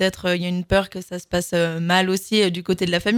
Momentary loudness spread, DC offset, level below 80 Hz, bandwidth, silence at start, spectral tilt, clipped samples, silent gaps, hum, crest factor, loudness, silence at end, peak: 7 LU; under 0.1%; -44 dBFS; 17 kHz; 0 s; -4.5 dB/octave; under 0.1%; none; none; 18 dB; -21 LUFS; 0 s; -2 dBFS